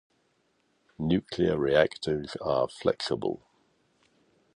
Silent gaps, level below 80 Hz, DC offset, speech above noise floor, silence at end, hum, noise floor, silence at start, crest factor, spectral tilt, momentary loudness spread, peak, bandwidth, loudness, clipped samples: none; -56 dBFS; under 0.1%; 44 dB; 1.2 s; none; -71 dBFS; 1 s; 22 dB; -6 dB/octave; 9 LU; -8 dBFS; 10.5 kHz; -28 LUFS; under 0.1%